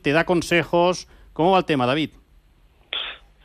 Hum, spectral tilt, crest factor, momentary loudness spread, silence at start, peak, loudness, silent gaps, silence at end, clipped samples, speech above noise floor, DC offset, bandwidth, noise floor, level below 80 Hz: none; -5 dB/octave; 16 dB; 12 LU; 0.05 s; -6 dBFS; -21 LUFS; none; 0.3 s; under 0.1%; 36 dB; under 0.1%; 14.5 kHz; -56 dBFS; -50 dBFS